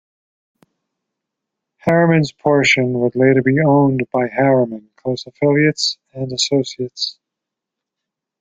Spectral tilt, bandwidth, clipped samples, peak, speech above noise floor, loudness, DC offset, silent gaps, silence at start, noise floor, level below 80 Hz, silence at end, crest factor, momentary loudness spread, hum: -5.5 dB/octave; 9.4 kHz; under 0.1%; -2 dBFS; 67 dB; -16 LUFS; under 0.1%; none; 1.85 s; -83 dBFS; -58 dBFS; 1.3 s; 16 dB; 11 LU; none